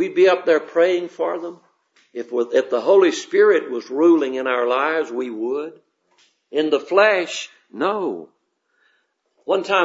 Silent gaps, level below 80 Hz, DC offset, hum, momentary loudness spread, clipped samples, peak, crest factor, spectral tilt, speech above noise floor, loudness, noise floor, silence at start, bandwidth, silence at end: none; -80 dBFS; under 0.1%; none; 14 LU; under 0.1%; -2 dBFS; 18 dB; -4 dB/octave; 48 dB; -19 LUFS; -66 dBFS; 0 s; 8 kHz; 0 s